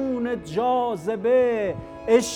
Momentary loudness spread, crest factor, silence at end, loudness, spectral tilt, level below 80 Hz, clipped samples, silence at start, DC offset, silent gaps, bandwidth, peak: 7 LU; 18 dB; 0 s; -23 LUFS; -5 dB/octave; -52 dBFS; under 0.1%; 0 s; under 0.1%; none; 15 kHz; -6 dBFS